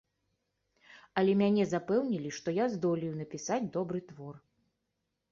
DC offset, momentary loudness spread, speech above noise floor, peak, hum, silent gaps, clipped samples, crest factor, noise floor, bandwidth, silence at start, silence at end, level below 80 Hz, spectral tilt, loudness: under 0.1%; 12 LU; 52 dB; -14 dBFS; none; none; under 0.1%; 20 dB; -83 dBFS; 7.4 kHz; 0.9 s; 0.95 s; -72 dBFS; -6.5 dB/octave; -32 LUFS